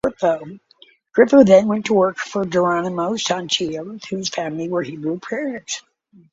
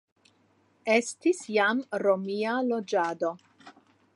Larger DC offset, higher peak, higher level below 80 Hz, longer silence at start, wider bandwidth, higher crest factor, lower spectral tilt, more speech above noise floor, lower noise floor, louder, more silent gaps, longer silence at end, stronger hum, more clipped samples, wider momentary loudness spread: neither; first, 0 dBFS vs -10 dBFS; first, -58 dBFS vs -84 dBFS; second, 0.05 s vs 0.85 s; second, 7.8 kHz vs 11.5 kHz; about the same, 18 dB vs 20 dB; about the same, -4.5 dB/octave vs -4 dB/octave; second, 34 dB vs 39 dB; second, -53 dBFS vs -66 dBFS; first, -19 LUFS vs -27 LUFS; neither; about the same, 0.55 s vs 0.45 s; neither; neither; first, 15 LU vs 8 LU